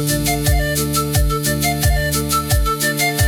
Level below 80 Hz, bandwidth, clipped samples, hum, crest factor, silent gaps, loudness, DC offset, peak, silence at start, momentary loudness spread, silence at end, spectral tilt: -24 dBFS; over 20 kHz; under 0.1%; none; 12 dB; none; -17 LUFS; under 0.1%; -4 dBFS; 0 s; 1 LU; 0 s; -4 dB/octave